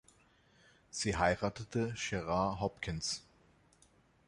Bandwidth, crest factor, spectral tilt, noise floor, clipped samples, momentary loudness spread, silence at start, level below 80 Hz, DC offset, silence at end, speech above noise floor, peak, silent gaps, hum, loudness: 11.5 kHz; 24 dB; -4.5 dB/octave; -68 dBFS; under 0.1%; 7 LU; 0.95 s; -56 dBFS; under 0.1%; 1.05 s; 32 dB; -14 dBFS; none; none; -36 LUFS